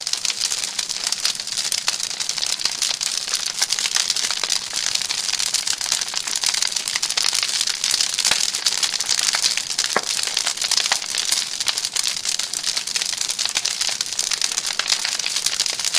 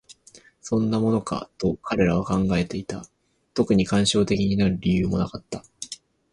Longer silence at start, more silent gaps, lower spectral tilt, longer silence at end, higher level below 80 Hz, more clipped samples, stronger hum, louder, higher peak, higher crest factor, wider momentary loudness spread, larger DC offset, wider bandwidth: about the same, 0 s vs 0.1 s; neither; second, 2.5 dB/octave vs -6 dB/octave; second, 0 s vs 0.4 s; second, -62 dBFS vs -44 dBFS; neither; neither; first, -19 LUFS vs -23 LUFS; first, 0 dBFS vs -6 dBFS; about the same, 22 dB vs 18 dB; second, 4 LU vs 16 LU; neither; first, 15.5 kHz vs 11 kHz